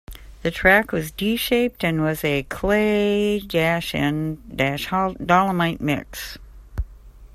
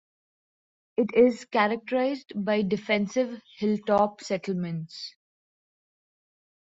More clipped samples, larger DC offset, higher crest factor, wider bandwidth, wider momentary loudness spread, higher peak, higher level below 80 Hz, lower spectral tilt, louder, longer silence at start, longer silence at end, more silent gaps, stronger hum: neither; neither; about the same, 20 dB vs 20 dB; first, 16 kHz vs 8 kHz; first, 16 LU vs 12 LU; first, -2 dBFS vs -8 dBFS; first, -40 dBFS vs -68 dBFS; about the same, -5.5 dB/octave vs -6 dB/octave; first, -21 LUFS vs -26 LUFS; second, 0.1 s vs 1 s; second, 0.05 s vs 1.65 s; neither; neither